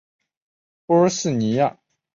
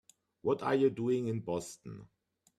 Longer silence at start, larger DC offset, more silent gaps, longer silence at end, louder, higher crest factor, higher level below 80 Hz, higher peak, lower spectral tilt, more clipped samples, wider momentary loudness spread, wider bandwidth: first, 0.9 s vs 0.45 s; neither; neither; about the same, 0.45 s vs 0.55 s; first, -20 LUFS vs -33 LUFS; about the same, 16 dB vs 18 dB; first, -62 dBFS vs -72 dBFS; first, -6 dBFS vs -18 dBFS; about the same, -5.5 dB/octave vs -6.5 dB/octave; neither; second, 5 LU vs 19 LU; second, 8 kHz vs 13 kHz